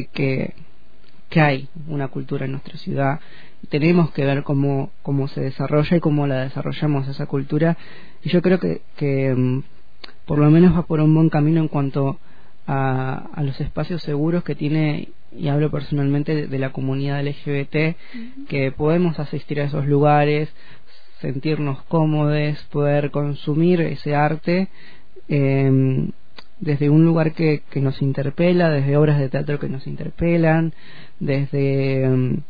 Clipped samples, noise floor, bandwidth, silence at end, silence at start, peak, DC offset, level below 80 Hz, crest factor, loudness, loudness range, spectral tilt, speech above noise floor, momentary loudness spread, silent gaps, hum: under 0.1%; -53 dBFS; 5 kHz; 0.05 s; 0 s; -4 dBFS; 4%; -46 dBFS; 16 dB; -20 LUFS; 5 LU; -10.5 dB/octave; 34 dB; 11 LU; none; none